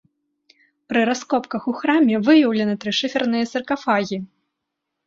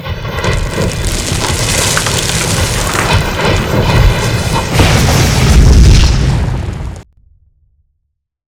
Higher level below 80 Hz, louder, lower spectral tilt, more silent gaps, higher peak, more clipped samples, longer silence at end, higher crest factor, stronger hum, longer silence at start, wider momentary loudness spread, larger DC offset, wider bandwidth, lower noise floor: second, -64 dBFS vs -14 dBFS; second, -20 LUFS vs -11 LUFS; about the same, -5 dB/octave vs -4.5 dB/octave; neither; second, -4 dBFS vs 0 dBFS; second, under 0.1% vs 0.9%; second, 0.8 s vs 1.5 s; first, 18 dB vs 10 dB; neither; first, 0.9 s vs 0 s; about the same, 10 LU vs 8 LU; neither; second, 7.6 kHz vs 19 kHz; first, -80 dBFS vs -67 dBFS